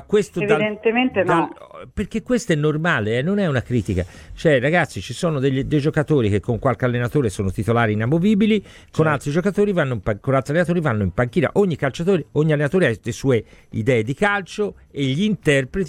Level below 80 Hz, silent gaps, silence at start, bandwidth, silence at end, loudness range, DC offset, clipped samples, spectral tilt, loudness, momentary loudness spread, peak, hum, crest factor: -44 dBFS; none; 0 s; 14.5 kHz; 0 s; 1 LU; under 0.1%; under 0.1%; -6.5 dB/octave; -20 LUFS; 7 LU; -2 dBFS; none; 16 dB